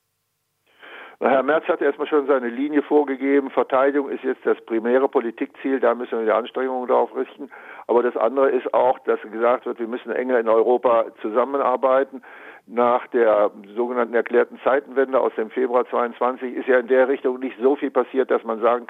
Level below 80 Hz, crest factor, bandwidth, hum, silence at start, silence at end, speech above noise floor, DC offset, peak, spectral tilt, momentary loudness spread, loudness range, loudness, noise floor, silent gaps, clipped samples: -76 dBFS; 18 dB; 4.1 kHz; none; 0.85 s; 0.05 s; 53 dB; under 0.1%; -4 dBFS; -7 dB/octave; 8 LU; 2 LU; -21 LUFS; -73 dBFS; none; under 0.1%